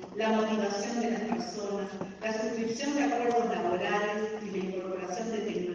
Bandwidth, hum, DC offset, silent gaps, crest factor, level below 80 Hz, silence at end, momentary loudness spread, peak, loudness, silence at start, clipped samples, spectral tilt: 7.8 kHz; none; under 0.1%; none; 14 dB; -68 dBFS; 0 s; 7 LU; -16 dBFS; -31 LUFS; 0 s; under 0.1%; -4.5 dB/octave